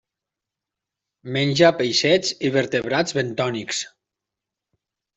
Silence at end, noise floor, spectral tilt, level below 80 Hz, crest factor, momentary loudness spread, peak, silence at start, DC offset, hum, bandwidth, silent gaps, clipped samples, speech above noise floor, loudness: 1.3 s; -86 dBFS; -4 dB/octave; -62 dBFS; 20 dB; 11 LU; -2 dBFS; 1.25 s; under 0.1%; none; 8.2 kHz; none; under 0.1%; 65 dB; -20 LUFS